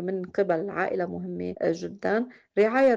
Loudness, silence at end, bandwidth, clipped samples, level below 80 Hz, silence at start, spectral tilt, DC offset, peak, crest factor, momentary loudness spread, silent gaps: -27 LUFS; 0 s; 7.4 kHz; under 0.1%; -66 dBFS; 0 s; -7 dB/octave; under 0.1%; -12 dBFS; 14 dB; 7 LU; none